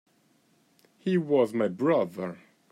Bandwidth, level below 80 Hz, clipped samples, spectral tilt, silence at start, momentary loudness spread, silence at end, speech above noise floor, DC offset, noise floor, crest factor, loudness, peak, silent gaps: 14 kHz; -80 dBFS; under 0.1%; -8 dB/octave; 1.05 s; 12 LU; 0.35 s; 40 dB; under 0.1%; -66 dBFS; 18 dB; -27 LUFS; -12 dBFS; none